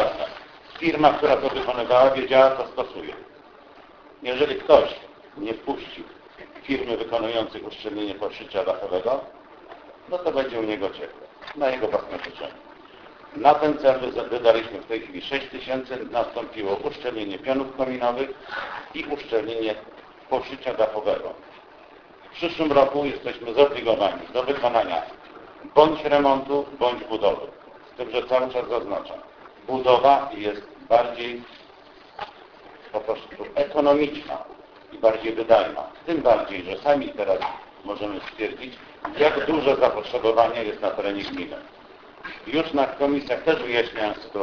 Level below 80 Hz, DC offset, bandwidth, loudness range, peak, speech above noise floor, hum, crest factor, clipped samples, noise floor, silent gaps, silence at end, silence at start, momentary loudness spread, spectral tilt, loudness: -56 dBFS; under 0.1%; 5.4 kHz; 6 LU; 0 dBFS; 25 dB; none; 24 dB; under 0.1%; -48 dBFS; none; 0 s; 0 s; 19 LU; -6 dB/octave; -23 LUFS